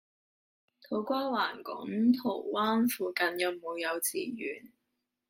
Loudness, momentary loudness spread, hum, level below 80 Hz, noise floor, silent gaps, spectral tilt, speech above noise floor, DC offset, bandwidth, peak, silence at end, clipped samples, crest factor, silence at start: -31 LUFS; 10 LU; none; -78 dBFS; -83 dBFS; none; -3.5 dB/octave; 52 dB; under 0.1%; 16 kHz; -14 dBFS; 0.65 s; under 0.1%; 18 dB; 0.9 s